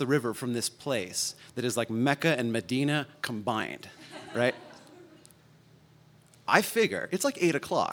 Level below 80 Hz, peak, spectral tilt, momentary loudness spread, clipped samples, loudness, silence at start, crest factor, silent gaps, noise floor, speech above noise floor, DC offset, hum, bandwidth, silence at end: -74 dBFS; -4 dBFS; -4 dB/octave; 11 LU; under 0.1%; -29 LUFS; 0 s; 26 dB; none; -58 dBFS; 29 dB; under 0.1%; none; 19.5 kHz; 0 s